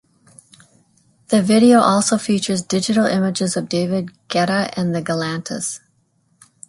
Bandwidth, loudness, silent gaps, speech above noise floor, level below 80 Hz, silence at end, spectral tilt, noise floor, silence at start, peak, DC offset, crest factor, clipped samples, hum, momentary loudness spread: 11.5 kHz; -18 LUFS; none; 45 dB; -60 dBFS; 0.9 s; -4.5 dB/octave; -62 dBFS; 1.3 s; -2 dBFS; under 0.1%; 16 dB; under 0.1%; none; 12 LU